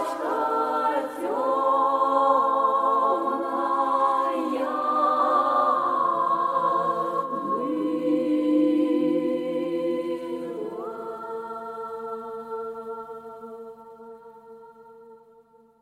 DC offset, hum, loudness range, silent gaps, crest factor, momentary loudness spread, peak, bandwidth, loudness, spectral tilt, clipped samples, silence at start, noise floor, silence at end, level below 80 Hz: under 0.1%; none; 14 LU; none; 16 dB; 14 LU; -8 dBFS; 14 kHz; -24 LUFS; -6 dB/octave; under 0.1%; 0 s; -56 dBFS; 0.65 s; -76 dBFS